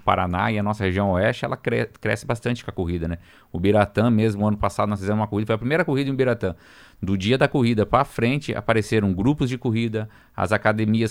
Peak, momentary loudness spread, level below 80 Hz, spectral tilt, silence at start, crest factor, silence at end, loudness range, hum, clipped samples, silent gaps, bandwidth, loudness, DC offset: -4 dBFS; 8 LU; -44 dBFS; -7 dB/octave; 0.05 s; 18 dB; 0 s; 2 LU; none; under 0.1%; none; 16 kHz; -22 LUFS; under 0.1%